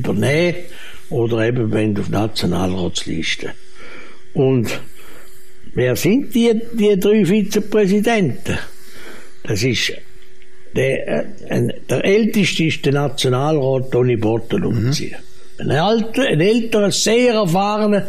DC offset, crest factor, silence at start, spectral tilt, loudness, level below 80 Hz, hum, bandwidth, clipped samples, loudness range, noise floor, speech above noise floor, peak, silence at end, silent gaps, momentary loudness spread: 5%; 12 dB; 0 s; -5.5 dB/octave; -17 LUFS; -44 dBFS; none; 15.5 kHz; under 0.1%; 5 LU; -47 dBFS; 31 dB; -6 dBFS; 0 s; none; 13 LU